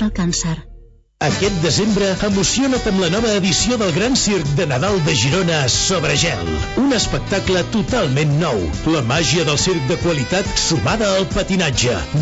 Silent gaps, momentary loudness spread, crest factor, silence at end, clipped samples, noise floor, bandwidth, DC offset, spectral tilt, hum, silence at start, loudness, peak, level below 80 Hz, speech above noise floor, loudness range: none; 4 LU; 12 dB; 0 s; under 0.1%; -42 dBFS; 8.2 kHz; under 0.1%; -4 dB/octave; none; 0 s; -17 LUFS; -4 dBFS; -32 dBFS; 25 dB; 2 LU